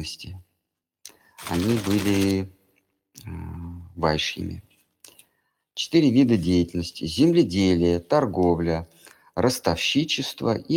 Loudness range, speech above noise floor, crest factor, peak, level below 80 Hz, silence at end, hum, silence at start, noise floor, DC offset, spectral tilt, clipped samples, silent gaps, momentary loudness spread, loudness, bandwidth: 8 LU; 59 dB; 18 dB; -6 dBFS; -48 dBFS; 0 s; none; 0 s; -81 dBFS; under 0.1%; -5.5 dB/octave; under 0.1%; none; 19 LU; -23 LUFS; 17.5 kHz